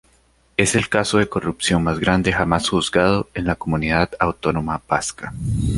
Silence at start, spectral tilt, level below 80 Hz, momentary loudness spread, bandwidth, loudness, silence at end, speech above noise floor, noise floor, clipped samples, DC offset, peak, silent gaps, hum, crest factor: 0.6 s; -4.5 dB/octave; -36 dBFS; 6 LU; 11.5 kHz; -20 LUFS; 0 s; 38 dB; -58 dBFS; under 0.1%; under 0.1%; 0 dBFS; none; none; 20 dB